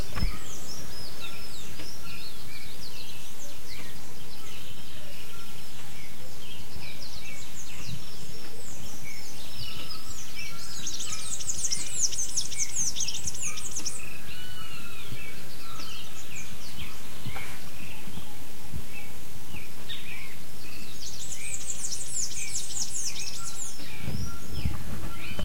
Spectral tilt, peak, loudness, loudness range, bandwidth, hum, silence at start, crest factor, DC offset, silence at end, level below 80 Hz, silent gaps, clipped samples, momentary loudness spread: -2 dB/octave; -10 dBFS; -35 LUFS; 12 LU; 16.5 kHz; none; 0 s; 24 dB; 10%; 0 s; -48 dBFS; none; under 0.1%; 14 LU